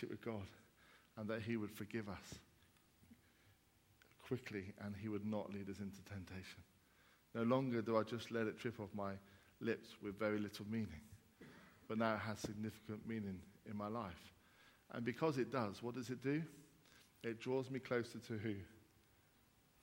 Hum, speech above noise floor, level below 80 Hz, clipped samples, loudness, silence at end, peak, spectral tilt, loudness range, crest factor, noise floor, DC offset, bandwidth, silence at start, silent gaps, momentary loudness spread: none; 29 dB; -76 dBFS; under 0.1%; -45 LUFS; 1 s; -22 dBFS; -6.5 dB/octave; 7 LU; 24 dB; -73 dBFS; under 0.1%; 16.5 kHz; 0 s; none; 18 LU